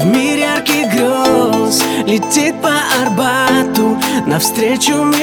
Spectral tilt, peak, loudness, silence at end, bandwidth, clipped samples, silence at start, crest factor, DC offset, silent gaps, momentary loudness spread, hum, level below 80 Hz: -3.5 dB/octave; 0 dBFS; -12 LUFS; 0 s; 19.5 kHz; under 0.1%; 0 s; 12 dB; under 0.1%; none; 2 LU; none; -50 dBFS